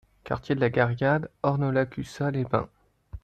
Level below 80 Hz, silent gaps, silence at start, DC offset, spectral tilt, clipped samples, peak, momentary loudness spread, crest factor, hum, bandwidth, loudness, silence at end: -52 dBFS; none; 0.25 s; under 0.1%; -8 dB/octave; under 0.1%; -8 dBFS; 10 LU; 20 dB; none; 9 kHz; -27 LUFS; 0.05 s